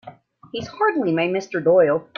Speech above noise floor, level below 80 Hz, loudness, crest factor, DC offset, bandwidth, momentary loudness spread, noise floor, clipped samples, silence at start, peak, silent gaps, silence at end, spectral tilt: 25 dB; -62 dBFS; -19 LUFS; 16 dB; under 0.1%; 7 kHz; 16 LU; -44 dBFS; under 0.1%; 0.05 s; -6 dBFS; none; 0.15 s; -6.5 dB/octave